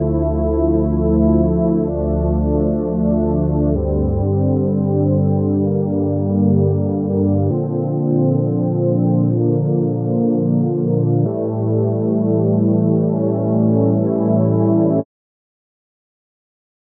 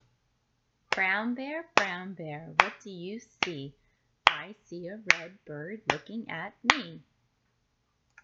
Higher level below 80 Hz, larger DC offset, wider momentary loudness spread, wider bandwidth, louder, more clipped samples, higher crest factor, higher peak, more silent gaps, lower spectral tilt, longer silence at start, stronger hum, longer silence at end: first, -30 dBFS vs -66 dBFS; neither; second, 4 LU vs 16 LU; second, 1.9 kHz vs 10.5 kHz; first, -17 LUFS vs -29 LUFS; neither; second, 12 dB vs 32 dB; second, -4 dBFS vs 0 dBFS; neither; first, -16.5 dB/octave vs -3 dB/octave; second, 0 s vs 0.9 s; neither; first, 1.85 s vs 1.25 s